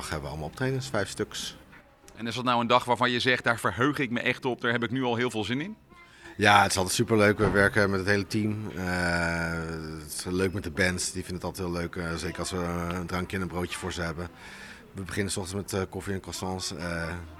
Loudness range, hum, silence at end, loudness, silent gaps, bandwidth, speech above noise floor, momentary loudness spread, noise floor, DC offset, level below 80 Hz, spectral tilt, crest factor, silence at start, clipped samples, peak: 9 LU; none; 0 s; -28 LUFS; none; 16 kHz; 25 dB; 13 LU; -53 dBFS; under 0.1%; -50 dBFS; -4.5 dB/octave; 26 dB; 0 s; under 0.1%; -2 dBFS